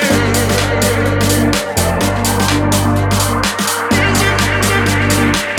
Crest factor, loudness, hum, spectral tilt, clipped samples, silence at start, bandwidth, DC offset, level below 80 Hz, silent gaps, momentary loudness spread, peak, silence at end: 14 dB; -13 LUFS; none; -4 dB/octave; under 0.1%; 0 s; 18.5 kHz; under 0.1%; -28 dBFS; none; 2 LU; 0 dBFS; 0 s